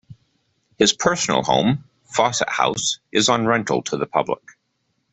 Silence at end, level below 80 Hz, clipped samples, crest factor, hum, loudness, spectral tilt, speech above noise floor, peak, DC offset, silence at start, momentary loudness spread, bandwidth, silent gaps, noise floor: 0.8 s; -56 dBFS; under 0.1%; 20 dB; none; -20 LUFS; -3 dB/octave; 51 dB; -2 dBFS; under 0.1%; 0.1 s; 7 LU; 8.4 kHz; none; -71 dBFS